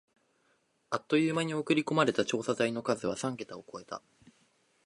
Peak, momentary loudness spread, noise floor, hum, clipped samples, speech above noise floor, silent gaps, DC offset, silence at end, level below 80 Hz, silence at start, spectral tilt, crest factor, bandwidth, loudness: -10 dBFS; 15 LU; -73 dBFS; none; under 0.1%; 42 dB; none; under 0.1%; 0.85 s; -72 dBFS; 0.9 s; -5 dB/octave; 22 dB; 11.5 kHz; -31 LUFS